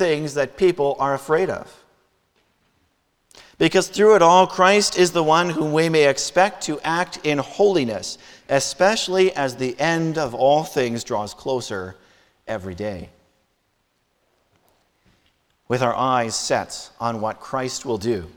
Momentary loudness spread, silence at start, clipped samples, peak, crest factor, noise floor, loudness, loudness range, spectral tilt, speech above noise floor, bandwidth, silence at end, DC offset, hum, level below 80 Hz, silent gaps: 14 LU; 0 s; under 0.1%; -2 dBFS; 20 dB; -68 dBFS; -20 LUFS; 15 LU; -4 dB/octave; 49 dB; 18.5 kHz; 0.05 s; under 0.1%; none; -56 dBFS; none